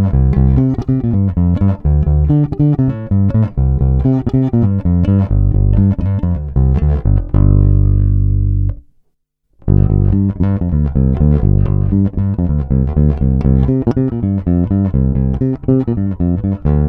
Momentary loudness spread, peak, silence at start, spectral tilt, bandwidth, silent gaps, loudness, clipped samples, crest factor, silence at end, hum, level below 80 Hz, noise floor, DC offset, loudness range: 4 LU; 0 dBFS; 0 s; -12.5 dB/octave; 3.1 kHz; none; -14 LUFS; under 0.1%; 12 dB; 0 s; 50 Hz at -30 dBFS; -18 dBFS; -63 dBFS; under 0.1%; 1 LU